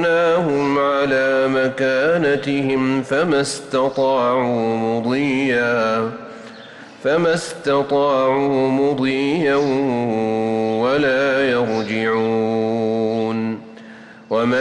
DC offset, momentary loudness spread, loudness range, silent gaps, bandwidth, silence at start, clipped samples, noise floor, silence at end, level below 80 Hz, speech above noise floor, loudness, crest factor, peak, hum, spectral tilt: under 0.1%; 6 LU; 2 LU; none; 11.5 kHz; 0 s; under 0.1%; -40 dBFS; 0 s; -58 dBFS; 22 dB; -18 LUFS; 10 dB; -8 dBFS; none; -5.5 dB/octave